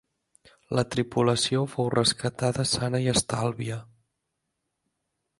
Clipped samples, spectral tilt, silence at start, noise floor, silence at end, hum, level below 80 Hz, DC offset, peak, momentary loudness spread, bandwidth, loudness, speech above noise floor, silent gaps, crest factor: under 0.1%; -4.5 dB/octave; 0.7 s; -81 dBFS; 1.55 s; none; -56 dBFS; under 0.1%; -8 dBFS; 7 LU; 11.5 kHz; -26 LUFS; 55 dB; none; 20 dB